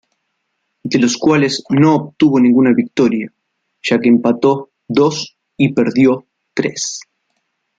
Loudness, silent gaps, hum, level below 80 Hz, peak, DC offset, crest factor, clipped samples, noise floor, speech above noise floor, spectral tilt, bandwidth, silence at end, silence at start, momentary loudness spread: -14 LUFS; none; none; -58 dBFS; 0 dBFS; under 0.1%; 14 dB; under 0.1%; -70 dBFS; 57 dB; -5.5 dB/octave; 9.2 kHz; 0.8 s; 0.85 s; 12 LU